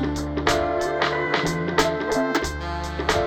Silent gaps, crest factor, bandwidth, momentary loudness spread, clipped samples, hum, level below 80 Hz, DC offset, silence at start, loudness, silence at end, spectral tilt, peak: none; 18 dB; over 20 kHz; 5 LU; under 0.1%; none; -38 dBFS; under 0.1%; 0 s; -23 LUFS; 0 s; -4.5 dB/octave; -6 dBFS